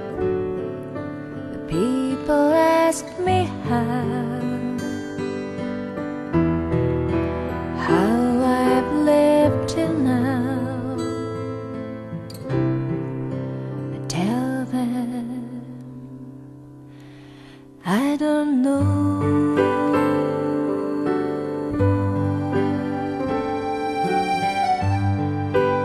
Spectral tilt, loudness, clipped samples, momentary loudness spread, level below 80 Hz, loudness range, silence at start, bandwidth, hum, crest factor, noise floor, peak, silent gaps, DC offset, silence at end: -7 dB/octave; -22 LUFS; under 0.1%; 13 LU; -46 dBFS; 8 LU; 0 s; 13 kHz; none; 18 dB; -43 dBFS; -4 dBFS; none; under 0.1%; 0 s